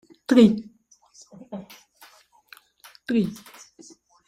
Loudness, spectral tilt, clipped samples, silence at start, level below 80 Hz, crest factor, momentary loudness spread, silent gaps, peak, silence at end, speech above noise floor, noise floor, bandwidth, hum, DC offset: -21 LUFS; -6.5 dB/octave; under 0.1%; 0.3 s; -64 dBFS; 22 dB; 25 LU; none; -4 dBFS; 0.95 s; 38 dB; -58 dBFS; 15 kHz; none; under 0.1%